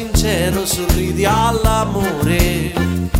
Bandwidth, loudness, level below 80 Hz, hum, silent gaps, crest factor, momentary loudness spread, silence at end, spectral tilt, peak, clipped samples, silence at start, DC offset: 16.5 kHz; -16 LUFS; -22 dBFS; none; none; 14 dB; 4 LU; 0 s; -5 dB/octave; -2 dBFS; under 0.1%; 0 s; under 0.1%